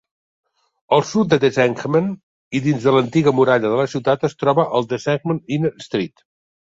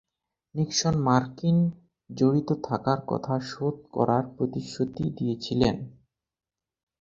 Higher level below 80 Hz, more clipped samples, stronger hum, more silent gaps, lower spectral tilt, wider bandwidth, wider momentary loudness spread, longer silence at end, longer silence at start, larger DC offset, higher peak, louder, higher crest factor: about the same, -58 dBFS vs -54 dBFS; neither; neither; first, 2.23-2.51 s vs none; about the same, -6.5 dB/octave vs -6 dB/octave; about the same, 7.8 kHz vs 7.6 kHz; about the same, 9 LU vs 7 LU; second, 0.65 s vs 1.1 s; first, 0.9 s vs 0.55 s; neither; first, 0 dBFS vs -6 dBFS; first, -18 LUFS vs -27 LUFS; about the same, 18 dB vs 22 dB